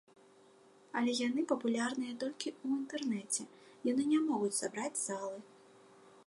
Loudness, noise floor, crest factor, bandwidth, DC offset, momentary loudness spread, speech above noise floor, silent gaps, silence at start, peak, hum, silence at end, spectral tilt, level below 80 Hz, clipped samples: -36 LUFS; -63 dBFS; 18 dB; 11.5 kHz; under 0.1%; 9 LU; 27 dB; none; 0.95 s; -18 dBFS; none; 0.15 s; -3 dB/octave; -88 dBFS; under 0.1%